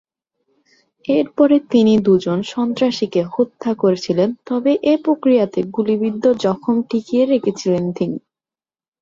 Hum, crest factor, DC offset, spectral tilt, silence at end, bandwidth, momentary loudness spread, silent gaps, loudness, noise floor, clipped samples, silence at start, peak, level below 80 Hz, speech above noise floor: none; 14 dB; under 0.1%; -7 dB/octave; 0.85 s; 7.6 kHz; 7 LU; none; -17 LUFS; under -90 dBFS; under 0.1%; 1.1 s; -2 dBFS; -60 dBFS; over 74 dB